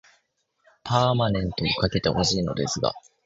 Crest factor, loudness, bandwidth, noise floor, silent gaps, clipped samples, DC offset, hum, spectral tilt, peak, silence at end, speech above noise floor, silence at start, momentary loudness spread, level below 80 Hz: 20 dB; -24 LUFS; 7.8 kHz; -70 dBFS; none; under 0.1%; under 0.1%; none; -5 dB/octave; -6 dBFS; 0.25 s; 47 dB; 0.85 s; 5 LU; -44 dBFS